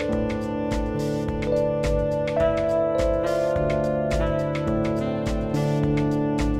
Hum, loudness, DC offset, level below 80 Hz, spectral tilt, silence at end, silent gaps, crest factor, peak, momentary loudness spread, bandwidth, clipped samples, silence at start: none; -24 LUFS; under 0.1%; -34 dBFS; -7.5 dB/octave; 0 s; none; 12 dB; -10 dBFS; 4 LU; 14.5 kHz; under 0.1%; 0 s